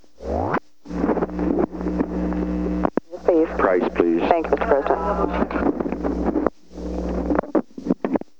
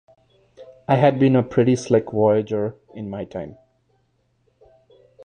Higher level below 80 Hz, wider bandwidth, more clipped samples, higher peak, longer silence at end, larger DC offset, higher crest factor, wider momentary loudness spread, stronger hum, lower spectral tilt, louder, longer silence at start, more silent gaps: first, -36 dBFS vs -56 dBFS; second, 7.6 kHz vs 9.6 kHz; neither; about the same, 0 dBFS vs -2 dBFS; second, 0.2 s vs 1.75 s; first, 0.6% vs under 0.1%; about the same, 22 dB vs 20 dB; second, 7 LU vs 17 LU; neither; about the same, -8.5 dB/octave vs -7.5 dB/octave; about the same, -22 LUFS vs -20 LUFS; second, 0.2 s vs 0.6 s; neither